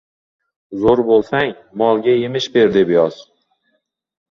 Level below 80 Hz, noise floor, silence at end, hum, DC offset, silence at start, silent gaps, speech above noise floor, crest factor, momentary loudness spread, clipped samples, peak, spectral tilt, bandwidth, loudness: -50 dBFS; -68 dBFS; 1.1 s; none; under 0.1%; 0.7 s; none; 53 dB; 16 dB; 7 LU; under 0.1%; -2 dBFS; -6 dB/octave; 7.2 kHz; -15 LUFS